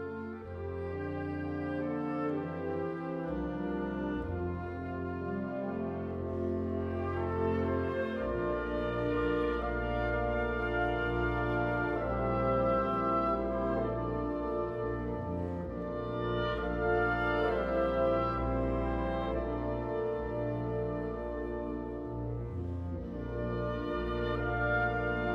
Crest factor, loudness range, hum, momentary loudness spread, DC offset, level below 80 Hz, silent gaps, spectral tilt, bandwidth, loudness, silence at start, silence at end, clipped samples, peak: 14 dB; 5 LU; none; 8 LU; under 0.1%; -44 dBFS; none; -9 dB/octave; 6.8 kHz; -34 LUFS; 0 s; 0 s; under 0.1%; -18 dBFS